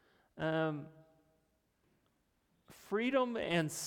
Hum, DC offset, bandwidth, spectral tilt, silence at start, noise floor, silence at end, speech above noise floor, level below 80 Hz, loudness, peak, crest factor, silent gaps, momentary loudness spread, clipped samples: none; under 0.1%; 19 kHz; -5 dB/octave; 0.35 s; -77 dBFS; 0 s; 42 dB; -74 dBFS; -36 LUFS; -20 dBFS; 18 dB; none; 10 LU; under 0.1%